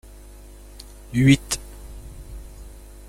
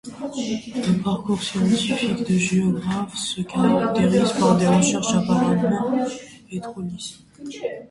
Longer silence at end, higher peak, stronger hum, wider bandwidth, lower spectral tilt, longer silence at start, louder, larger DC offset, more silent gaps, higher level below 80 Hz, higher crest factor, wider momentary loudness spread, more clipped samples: first, 0.4 s vs 0.05 s; about the same, -2 dBFS vs -4 dBFS; first, 50 Hz at -40 dBFS vs none; first, 15.5 kHz vs 11.5 kHz; about the same, -5 dB/octave vs -5.5 dB/octave; first, 1.1 s vs 0.05 s; about the same, -20 LUFS vs -21 LUFS; neither; neither; first, -40 dBFS vs -54 dBFS; about the same, 22 dB vs 18 dB; first, 26 LU vs 14 LU; neither